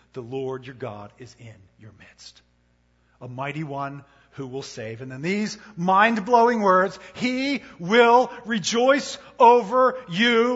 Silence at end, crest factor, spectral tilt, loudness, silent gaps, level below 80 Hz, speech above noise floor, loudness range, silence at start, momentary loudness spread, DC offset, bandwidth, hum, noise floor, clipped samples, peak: 0 s; 20 dB; -4.5 dB/octave; -21 LUFS; none; -64 dBFS; 41 dB; 18 LU; 0.15 s; 19 LU; under 0.1%; 8 kHz; 60 Hz at -55 dBFS; -64 dBFS; under 0.1%; -4 dBFS